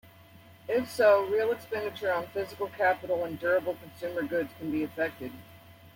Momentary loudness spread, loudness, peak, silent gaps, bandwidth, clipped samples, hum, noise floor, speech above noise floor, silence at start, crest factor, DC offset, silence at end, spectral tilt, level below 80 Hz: 13 LU; -29 LUFS; -12 dBFS; none; 16.5 kHz; under 0.1%; none; -54 dBFS; 25 dB; 0.35 s; 18 dB; under 0.1%; 0.05 s; -5.5 dB/octave; -68 dBFS